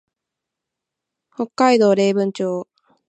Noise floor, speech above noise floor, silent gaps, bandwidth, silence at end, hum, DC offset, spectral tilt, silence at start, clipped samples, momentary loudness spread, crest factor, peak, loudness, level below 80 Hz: -83 dBFS; 66 dB; none; 8.8 kHz; 0.45 s; none; under 0.1%; -5.5 dB/octave; 1.4 s; under 0.1%; 14 LU; 18 dB; -2 dBFS; -17 LUFS; -76 dBFS